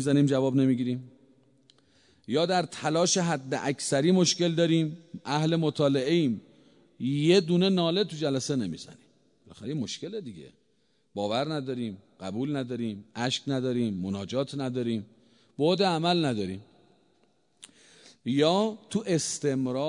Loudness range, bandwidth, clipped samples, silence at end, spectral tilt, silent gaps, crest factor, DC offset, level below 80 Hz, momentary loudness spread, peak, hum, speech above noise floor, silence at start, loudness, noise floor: 8 LU; 11 kHz; under 0.1%; 0 s; -5 dB/octave; none; 18 dB; under 0.1%; -72 dBFS; 13 LU; -10 dBFS; none; 44 dB; 0 s; -27 LUFS; -71 dBFS